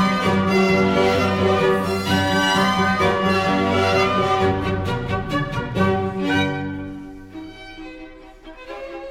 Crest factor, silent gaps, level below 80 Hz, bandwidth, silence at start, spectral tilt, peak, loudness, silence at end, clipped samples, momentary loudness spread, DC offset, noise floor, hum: 14 dB; none; -42 dBFS; 16.5 kHz; 0 s; -5.5 dB/octave; -6 dBFS; -19 LUFS; 0 s; under 0.1%; 19 LU; under 0.1%; -41 dBFS; none